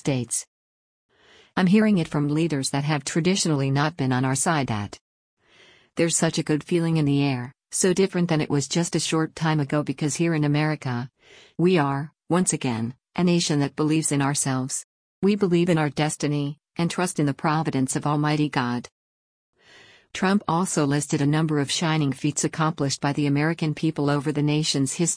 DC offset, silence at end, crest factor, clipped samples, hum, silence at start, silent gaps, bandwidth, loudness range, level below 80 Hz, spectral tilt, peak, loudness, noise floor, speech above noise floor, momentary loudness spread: under 0.1%; 0 s; 16 dB; under 0.1%; none; 0.05 s; 0.48-1.09 s, 5.01-5.37 s, 14.84-15.22 s, 18.92-19.53 s; 10.5 kHz; 3 LU; -60 dBFS; -5 dB/octave; -8 dBFS; -23 LUFS; -55 dBFS; 32 dB; 7 LU